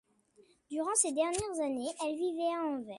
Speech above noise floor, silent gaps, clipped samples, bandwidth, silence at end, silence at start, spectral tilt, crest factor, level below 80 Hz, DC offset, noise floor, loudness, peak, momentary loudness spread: 33 dB; none; under 0.1%; 11.5 kHz; 0 s; 0.7 s; -3 dB/octave; 20 dB; -66 dBFS; under 0.1%; -66 dBFS; -33 LUFS; -14 dBFS; 7 LU